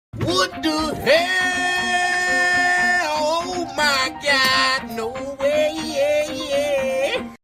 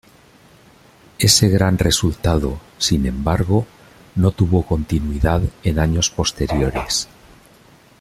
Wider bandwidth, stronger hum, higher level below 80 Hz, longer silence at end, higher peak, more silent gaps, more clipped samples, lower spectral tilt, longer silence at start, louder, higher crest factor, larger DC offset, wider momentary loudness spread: about the same, 16 kHz vs 15.5 kHz; neither; second, -50 dBFS vs -30 dBFS; second, 0.1 s vs 0.95 s; second, -4 dBFS vs 0 dBFS; neither; neither; second, -2.5 dB/octave vs -4.5 dB/octave; second, 0.15 s vs 1.2 s; about the same, -19 LUFS vs -18 LUFS; about the same, 16 dB vs 18 dB; neither; about the same, 7 LU vs 8 LU